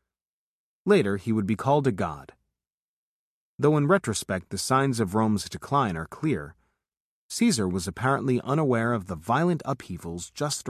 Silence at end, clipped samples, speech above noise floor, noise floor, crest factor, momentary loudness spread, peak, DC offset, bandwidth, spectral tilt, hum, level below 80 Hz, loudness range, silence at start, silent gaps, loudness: 0 s; under 0.1%; over 65 dB; under -90 dBFS; 18 dB; 10 LU; -8 dBFS; under 0.1%; 14 kHz; -5.5 dB/octave; none; -52 dBFS; 2 LU; 0.85 s; 2.74-3.58 s, 7.00-7.29 s; -26 LUFS